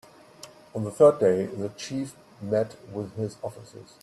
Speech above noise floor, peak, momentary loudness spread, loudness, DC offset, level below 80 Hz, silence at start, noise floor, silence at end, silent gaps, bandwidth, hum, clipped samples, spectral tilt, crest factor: 23 dB; -6 dBFS; 26 LU; -26 LUFS; under 0.1%; -68 dBFS; 0.45 s; -49 dBFS; 0.2 s; none; 13 kHz; none; under 0.1%; -6.5 dB/octave; 20 dB